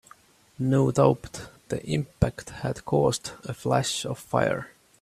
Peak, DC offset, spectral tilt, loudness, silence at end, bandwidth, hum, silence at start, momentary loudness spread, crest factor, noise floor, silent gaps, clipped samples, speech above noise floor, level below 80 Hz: -6 dBFS; under 0.1%; -5.5 dB/octave; -26 LUFS; 0.35 s; 14.5 kHz; none; 0.6 s; 12 LU; 22 dB; -56 dBFS; none; under 0.1%; 30 dB; -48 dBFS